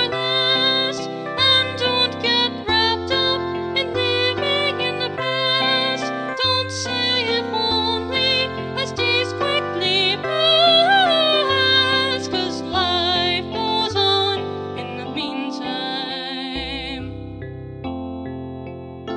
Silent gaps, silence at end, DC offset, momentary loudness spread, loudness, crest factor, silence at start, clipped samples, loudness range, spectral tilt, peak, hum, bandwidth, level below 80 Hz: none; 0 s; under 0.1%; 14 LU; -18 LUFS; 16 dB; 0 s; under 0.1%; 11 LU; -4 dB/octave; -4 dBFS; none; 10.5 kHz; -48 dBFS